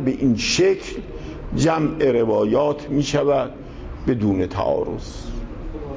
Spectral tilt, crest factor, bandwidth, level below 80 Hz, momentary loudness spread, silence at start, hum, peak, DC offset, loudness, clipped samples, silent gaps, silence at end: -5.5 dB/octave; 14 dB; 8 kHz; -36 dBFS; 15 LU; 0 s; none; -6 dBFS; under 0.1%; -20 LUFS; under 0.1%; none; 0 s